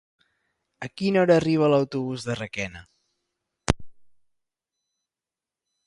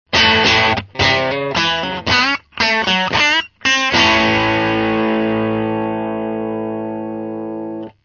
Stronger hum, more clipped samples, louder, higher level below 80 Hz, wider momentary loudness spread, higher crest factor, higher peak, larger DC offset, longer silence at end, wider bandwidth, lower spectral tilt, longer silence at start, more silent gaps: neither; neither; second, -24 LUFS vs -15 LUFS; second, -48 dBFS vs -42 dBFS; about the same, 15 LU vs 13 LU; first, 26 dB vs 16 dB; about the same, 0 dBFS vs 0 dBFS; neither; first, 1.95 s vs 0.15 s; first, 11.5 kHz vs 7.4 kHz; first, -6 dB/octave vs -3.5 dB/octave; first, 0.8 s vs 0.1 s; neither